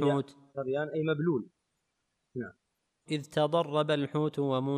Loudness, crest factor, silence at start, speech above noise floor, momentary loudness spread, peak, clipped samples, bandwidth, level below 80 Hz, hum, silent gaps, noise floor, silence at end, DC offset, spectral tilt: -32 LUFS; 16 dB; 0 s; 50 dB; 13 LU; -16 dBFS; under 0.1%; 11.5 kHz; -76 dBFS; none; none; -81 dBFS; 0 s; under 0.1%; -7 dB/octave